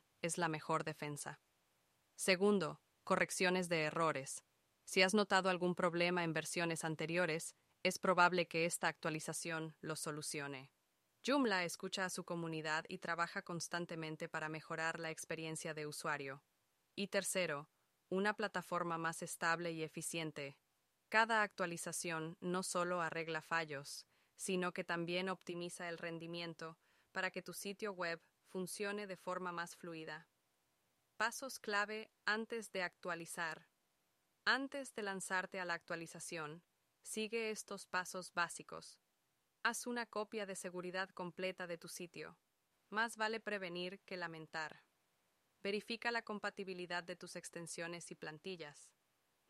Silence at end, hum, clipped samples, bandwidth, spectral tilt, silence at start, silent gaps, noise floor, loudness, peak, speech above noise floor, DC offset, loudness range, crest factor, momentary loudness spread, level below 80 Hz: 0.6 s; none; under 0.1%; 15 kHz; -3.5 dB/octave; 0.25 s; none; -84 dBFS; -41 LUFS; -16 dBFS; 43 dB; under 0.1%; 8 LU; 26 dB; 14 LU; -86 dBFS